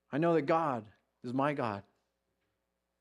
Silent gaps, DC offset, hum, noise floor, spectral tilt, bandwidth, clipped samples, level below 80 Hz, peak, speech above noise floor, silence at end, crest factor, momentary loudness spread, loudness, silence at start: none; under 0.1%; none; -83 dBFS; -8 dB/octave; 10.5 kHz; under 0.1%; -82 dBFS; -16 dBFS; 52 dB; 1.2 s; 18 dB; 13 LU; -32 LUFS; 0.1 s